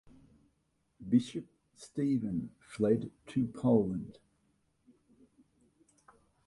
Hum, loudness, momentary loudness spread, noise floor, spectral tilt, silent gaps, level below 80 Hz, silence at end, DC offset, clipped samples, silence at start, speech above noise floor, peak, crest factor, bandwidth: none; -33 LUFS; 17 LU; -77 dBFS; -8 dB/octave; none; -66 dBFS; 2.35 s; under 0.1%; under 0.1%; 1 s; 45 dB; -14 dBFS; 22 dB; 11.5 kHz